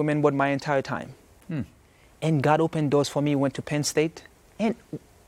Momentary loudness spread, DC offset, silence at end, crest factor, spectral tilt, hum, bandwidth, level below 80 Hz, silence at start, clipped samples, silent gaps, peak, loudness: 13 LU; under 0.1%; 0.3 s; 20 dB; -6 dB/octave; none; 15.5 kHz; -60 dBFS; 0 s; under 0.1%; none; -6 dBFS; -25 LUFS